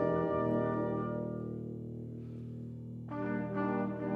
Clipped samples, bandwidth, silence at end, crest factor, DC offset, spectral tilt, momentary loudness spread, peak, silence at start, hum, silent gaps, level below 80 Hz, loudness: under 0.1%; 5 kHz; 0 s; 18 dB; under 0.1%; -10.5 dB/octave; 12 LU; -18 dBFS; 0 s; none; none; -62 dBFS; -37 LUFS